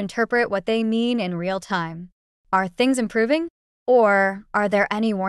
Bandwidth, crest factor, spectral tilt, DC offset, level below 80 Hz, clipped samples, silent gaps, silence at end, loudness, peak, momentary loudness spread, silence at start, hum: 12.5 kHz; 14 dB; -5.5 dB/octave; under 0.1%; -58 dBFS; under 0.1%; 2.12-2.44 s, 3.50-3.86 s; 0 s; -21 LUFS; -6 dBFS; 9 LU; 0 s; none